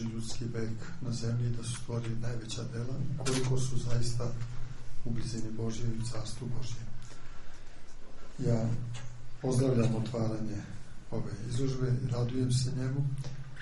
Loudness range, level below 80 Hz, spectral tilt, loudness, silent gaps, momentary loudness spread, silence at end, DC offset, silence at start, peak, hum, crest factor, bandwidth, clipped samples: 6 LU; -44 dBFS; -6 dB/octave; -35 LUFS; none; 18 LU; 0 s; under 0.1%; 0 s; -16 dBFS; none; 16 dB; 11.5 kHz; under 0.1%